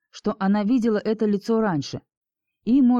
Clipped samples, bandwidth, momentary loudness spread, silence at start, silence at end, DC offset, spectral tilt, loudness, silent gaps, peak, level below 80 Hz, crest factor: under 0.1%; 7.6 kHz; 12 LU; 0.15 s; 0 s; under 0.1%; -7 dB/octave; -22 LUFS; 2.17-2.22 s; -12 dBFS; -56 dBFS; 10 dB